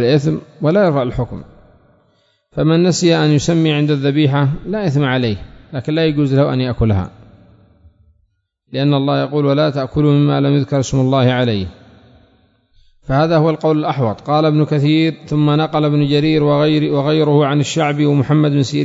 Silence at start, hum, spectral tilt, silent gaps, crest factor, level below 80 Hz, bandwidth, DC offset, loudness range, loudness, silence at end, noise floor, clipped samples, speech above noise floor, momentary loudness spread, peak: 0 s; none; -7 dB/octave; none; 14 dB; -42 dBFS; 7.8 kHz; under 0.1%; 5 LU; -15 LUFS; 0 s; -63 dBFS; under 0.1%; 49 dB; 7 LU; 0 dBFS